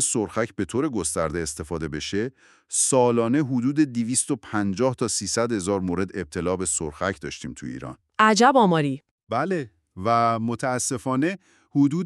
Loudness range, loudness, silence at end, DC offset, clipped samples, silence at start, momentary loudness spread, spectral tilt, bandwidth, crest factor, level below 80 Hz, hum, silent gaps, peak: 4 LU; -23 LUFS; 0 s; under 0.1%; under 0.1%; 0 s; 13 LU; -4.5 dB/octave; 13.5 kHz; 20 dB; -52 dBFS; none; 9.11-9.18 s; -4 dBFS